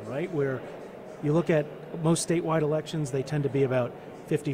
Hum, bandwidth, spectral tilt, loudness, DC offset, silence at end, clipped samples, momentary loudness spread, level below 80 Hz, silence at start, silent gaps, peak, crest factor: none; 15.5 kHz; -6 dB/octave; -28 LUFS; under 0.1%; 0 s; under 0.1%; 12 LU; -60 dBFS; 0 s; none; -14 dBFS; 14 dB